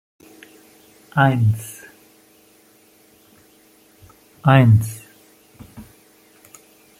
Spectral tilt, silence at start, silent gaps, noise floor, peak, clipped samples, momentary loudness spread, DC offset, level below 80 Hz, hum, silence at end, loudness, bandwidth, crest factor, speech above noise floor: -7 dB/octave; 1.15 s; none; -53 dBFS; -2 dBFS; under 0.1%; 27 LU; under 0.1%; -56 dBFS; none; 1.2 s; -17 LUFS; 16 kHz; 20 dB; 38 dB